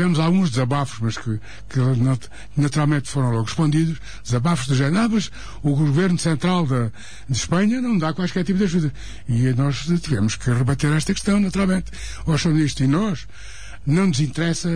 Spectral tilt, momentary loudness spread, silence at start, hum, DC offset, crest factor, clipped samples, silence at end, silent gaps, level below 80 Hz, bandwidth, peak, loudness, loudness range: -6 dB/octave; 10 LU; 0 s; none; 2%; 10 dB; under 0.1%; 0 s; none; -40 dBFS; 10.5 kHz; -8 dBFS; -21 LUFS; 1 LU